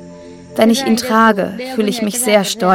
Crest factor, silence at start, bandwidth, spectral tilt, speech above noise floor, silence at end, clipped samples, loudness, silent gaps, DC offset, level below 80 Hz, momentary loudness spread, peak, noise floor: 14 dB; 0 s; 17 kHz; -4 dB/octave; 21 dB; 0 s; under 0.1%; -14 LUFS; none; under 0.1%; -56 dBFS; 7 LU; 0 dBFS; -35 dBFS